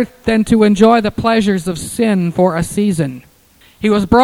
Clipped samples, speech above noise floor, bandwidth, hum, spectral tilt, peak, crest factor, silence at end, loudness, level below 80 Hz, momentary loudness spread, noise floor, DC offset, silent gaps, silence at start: under 0.1%; 35 dB; 13.5 kHz; none; -6 dB/octave; 0 dBFS; 14 dB; 0 s; -14 LUFS; -38 dBFS; 9 LU; -48 dBFS; under 0.1%; none; 0 s